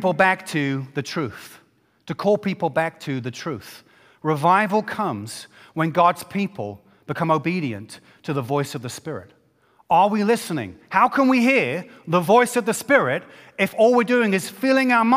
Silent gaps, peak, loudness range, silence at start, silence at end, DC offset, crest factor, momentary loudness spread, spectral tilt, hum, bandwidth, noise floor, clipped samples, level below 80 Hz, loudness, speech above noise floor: none; -2 dBFS; 7 LU; 0 s; 0 s; under 0.1%; 20 dB; 16 LU; -5.5 dB/octave; none; 16 kHz; -59 dBFS; under 0.1%; -66 dBFS; -21 LUFS; 39 dB